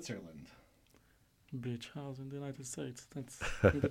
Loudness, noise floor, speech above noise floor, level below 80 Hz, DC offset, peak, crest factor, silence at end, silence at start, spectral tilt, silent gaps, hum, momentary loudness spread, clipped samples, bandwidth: -39 LUFS; -69 dBFS; 32 dB; -54 dBFS; under 0.1%; -14 dBFS; 26 dB; 0 s; 0 s; -6 dB/octave; none; none; 19 LU; under 0.1%; 16 kHz